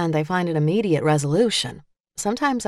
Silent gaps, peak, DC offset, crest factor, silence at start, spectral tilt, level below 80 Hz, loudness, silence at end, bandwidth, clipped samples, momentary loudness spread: 2.00-2.04 s; -6 dBFS; under 0.1%; 14 dB; 0 s; -5 dB/octave; -56 dBFS; -21 LUFS; 0 s; 13 kHz; under 0.1%; 9 LU